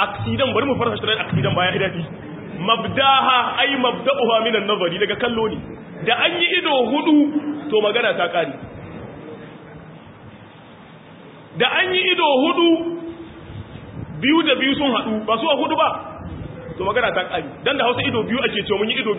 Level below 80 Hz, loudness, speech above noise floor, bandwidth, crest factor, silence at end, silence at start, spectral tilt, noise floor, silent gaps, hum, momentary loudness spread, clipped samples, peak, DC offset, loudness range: -48 dBFS; -18 LUFS; 23 dB; 4 kHz; 18 dB; 0 s; 0 s; -10 dB/octave; -42 dBFS; none; none; 19 LU; under 0.1%; -2 dBFS; under 0.1%; 6 LU